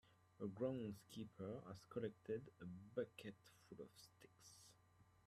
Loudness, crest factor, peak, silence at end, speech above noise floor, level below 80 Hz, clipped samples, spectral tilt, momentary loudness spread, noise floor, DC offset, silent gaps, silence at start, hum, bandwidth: -52 LUFS; 20 dB; -32 dBFS; 0.2 s; 22 dB; -84 dBFS; under 0.1%; -6.5 dB/octave; 19 LU; -74 dBFS; under 0.1%; none; 0.05 s; none; 15 kHz